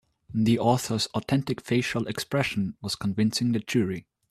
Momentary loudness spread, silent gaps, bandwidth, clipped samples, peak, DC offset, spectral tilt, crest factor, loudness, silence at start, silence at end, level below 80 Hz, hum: 7 LU; none; 14 kHz; under 0.1%; -8 dBFS; under 0.1%; -5.5 dB/octave; 18 dB; -27 LUFS; 0.3 s; 0.3 s; -58 dBFS; none